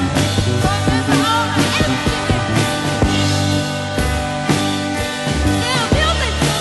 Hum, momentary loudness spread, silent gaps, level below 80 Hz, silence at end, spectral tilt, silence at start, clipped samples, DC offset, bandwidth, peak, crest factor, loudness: none; 4 LU; none; -28 dBFS; 0 s; -4.5 dB/octave; 0 s; under 0.1%; under 0.1%; 12 kHz; -2 dBFS; 16 dB; -17 LUFS